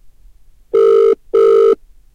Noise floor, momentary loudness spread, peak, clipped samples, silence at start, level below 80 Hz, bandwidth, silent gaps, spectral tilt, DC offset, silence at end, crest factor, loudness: -43 dBFS; 7 LU; -4 dBFS; under 0.1%; 0.75 s; -48 dBFS; 6.8 kHz; none; -5.5 dB/octave; under 0.1%; 0.4 s; 8 dB; -12 LUFS